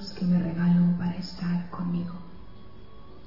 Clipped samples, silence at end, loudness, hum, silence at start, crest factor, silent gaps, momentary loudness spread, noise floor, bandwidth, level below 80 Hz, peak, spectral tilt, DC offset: under 0.1%; 0 s; -27 LUFS; none; 0 s; 12 dB; none; 14 LU; -48 dBFS; 5.8 kHz; -52 dBFS; -16 dBFS; -8.5 dB/octave; 0.9%